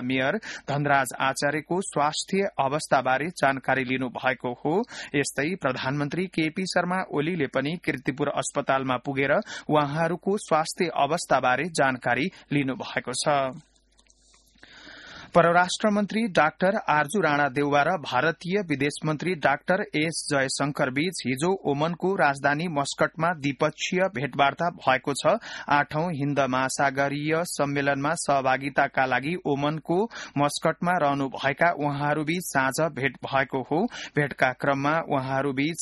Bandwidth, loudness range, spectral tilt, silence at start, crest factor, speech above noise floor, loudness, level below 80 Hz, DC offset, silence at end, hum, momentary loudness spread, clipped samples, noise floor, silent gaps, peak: 12 kHz; 3 LU; -4.5 dB/octave; 0 s; 20 dB; 36 dB; -25 LUFS; -62 dBFS; under 0.1%; 0 s; none; 5 LU; under 0.1%; -61 dBFS; none; -6 dBFS